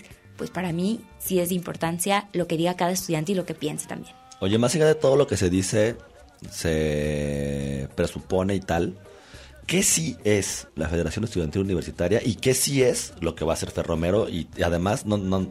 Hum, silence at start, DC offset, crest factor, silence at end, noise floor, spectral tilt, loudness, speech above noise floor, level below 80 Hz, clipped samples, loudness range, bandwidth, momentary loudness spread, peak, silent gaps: none; 0 s; under 0.1%; 16 dB; 0 s; -46 dBFS; -4.5 dB/octave; -24 LUFS; 22 dB; -44 dBFS; under 0.1%; 3 LU; 16 kHz; 10 LU; -8 dBFS; none